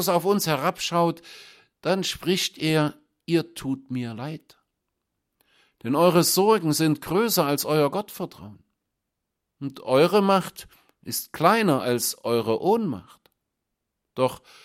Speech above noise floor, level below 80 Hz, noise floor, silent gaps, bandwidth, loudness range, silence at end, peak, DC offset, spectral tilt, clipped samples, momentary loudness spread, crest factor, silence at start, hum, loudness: 58 dB; -62 dBFS; -82 dBFS; none; 16.5 kHz; 5 LU; 0.25 s; -4 dBFS; under 0.1%; -4.5 dB/octave; under 0.1%; 18 LU; 20 dB; 0 s; none; -23 LUFS